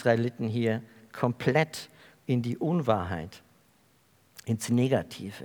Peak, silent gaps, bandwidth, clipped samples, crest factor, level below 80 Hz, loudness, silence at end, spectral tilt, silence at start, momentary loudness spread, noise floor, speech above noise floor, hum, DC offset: -10 dBFS; none; over 20 kHz; under 0.1%; 20 dB; -68 dBFS; -29 LUFS; 0 s; -6.5 dB/octave; 0 s; 17 LU; -64 dBFS; 36 dB; none; under 0.1%